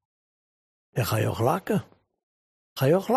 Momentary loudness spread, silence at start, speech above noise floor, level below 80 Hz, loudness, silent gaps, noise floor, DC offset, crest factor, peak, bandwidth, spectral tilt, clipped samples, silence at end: 9 LU; 0.95 s; over 66 dB; -60 dBFS; -26 LUFS; 2.23-2.76 s; under -90 dBFS; under 0.1%; 18 dB; -8 dBFS; 15 kHz; -6.5 dB/octave; under 0.1%; 0 s